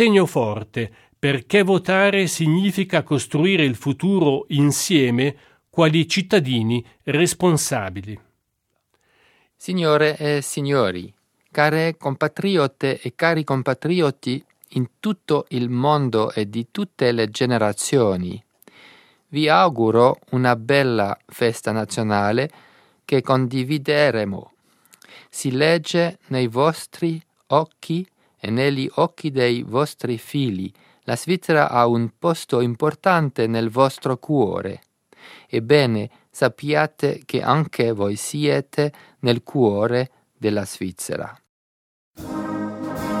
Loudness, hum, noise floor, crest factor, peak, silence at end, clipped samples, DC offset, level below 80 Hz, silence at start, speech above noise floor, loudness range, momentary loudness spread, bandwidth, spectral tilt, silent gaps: -20 LUFS; none; -73 dBFS; 20 dB; 0 dBFS; 0 s; under 0.1%; under 0.1%; -60 dBFS; 0 s; 53 dB; 4 LU; 11 LU; 16.5 kHz; -5.5 dB/octave; 41.49-42.14 s